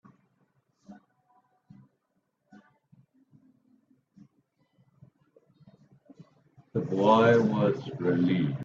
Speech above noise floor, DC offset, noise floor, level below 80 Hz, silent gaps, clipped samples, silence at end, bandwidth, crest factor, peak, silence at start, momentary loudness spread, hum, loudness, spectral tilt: 53 dB; under 0.1%; -77 dBFS; -70 dBFS; none; under 0.1%; 0 s; 7.4 kHz; 22 dB; -8 dBFS; 0.9 s; 12 LU; none; -25 LUFS; -8 dB/octave